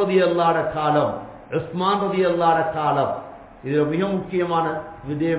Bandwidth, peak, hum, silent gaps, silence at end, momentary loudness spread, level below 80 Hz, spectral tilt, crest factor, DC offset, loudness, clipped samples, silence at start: 4 kHz; -4 dBFS; none; none; 0 s; 12 LU; -52 dBFS; -10.5 dB/octave; 16 dB; under 0.1%; -21 LUFS; under 0.1%; 0 s